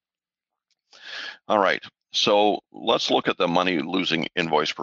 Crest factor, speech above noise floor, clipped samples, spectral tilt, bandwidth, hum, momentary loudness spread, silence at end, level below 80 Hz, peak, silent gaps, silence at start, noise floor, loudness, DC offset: 20 dB; over 68 dB; under 0.1%; -4 dB/octave; 7.8 kHz; none; 11 LU; 0 s; -68 dBFS; -6 dBFS; none; 1.05 s; under -90 dBFS; -22 LUFS; under 0.1%